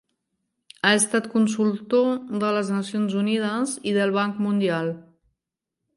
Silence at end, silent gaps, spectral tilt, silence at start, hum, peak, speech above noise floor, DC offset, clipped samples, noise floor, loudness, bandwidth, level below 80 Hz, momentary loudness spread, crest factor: 0.95 s; none; -4.5 dB/octave; 0.85 s; none; -4 dBFS; 62 dB; under 0.1%; under 0.1%; -85 dBFS; -23 LUFS; 11.5 kHz; -72 dBFS; 6 LU; 20 dB